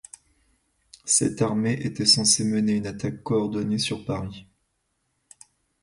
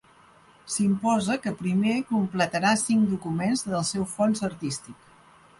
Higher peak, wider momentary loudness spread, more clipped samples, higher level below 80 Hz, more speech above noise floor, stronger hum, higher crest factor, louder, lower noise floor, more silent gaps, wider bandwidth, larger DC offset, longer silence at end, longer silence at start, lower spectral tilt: first, -6 dBFS vs -10 dBFS; first, 14 LU vs 7 LU; neither; about the same, -56 dBFS vs -60 dBFS; first, 50 dB vs 30 dB; neither; about the same, 20 dB vs 16 dB; about the same, -23 LUFS vs -25 LUFS; first, -74 dBFS vs -55 dBFS; neither; about the same, 11.5 kHz vs 11.5 kHz; neither; first, 1.4 s vs 0.65 s; first, 1.05 s vs 0.65 s; second, -3.5 dB/octave vs -5 dB/octave